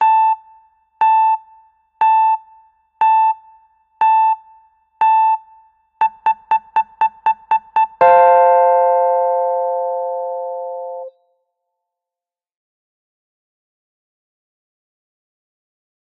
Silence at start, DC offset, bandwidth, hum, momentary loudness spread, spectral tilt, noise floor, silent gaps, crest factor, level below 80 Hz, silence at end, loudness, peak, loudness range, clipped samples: 0 s; under 0.1%; 3.9 kHz; none; 13 LU; -4.5 dB/octave; -89 dBFS; none; 18 dB; -68 dBFS; 4.95 s; -15 LUFS; 0 dBFS; 12 LU; under 0.1%